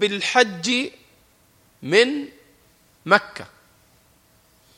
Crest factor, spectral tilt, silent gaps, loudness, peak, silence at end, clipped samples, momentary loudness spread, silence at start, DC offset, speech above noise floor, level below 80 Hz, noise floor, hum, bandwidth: 24 dB; -3 dB/octave; none; -20 LUFS; 0 dBFS; 1.3 s; under 0.1%; 21 LU; 0 s; under 0.1%; 38 dB; -66 dBFS; -58 dBFS; none; 16 kHz